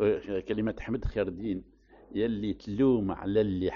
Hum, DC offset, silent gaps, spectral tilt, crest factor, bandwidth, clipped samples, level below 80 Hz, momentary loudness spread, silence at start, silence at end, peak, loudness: none; under 0.1%; none; -7 dB/octave; 16 dB; 6.8 kHz; under 0.1%; -46 dBFS; 9 LU; 0 s; 0 s; -14 dBFS; -30 LUFS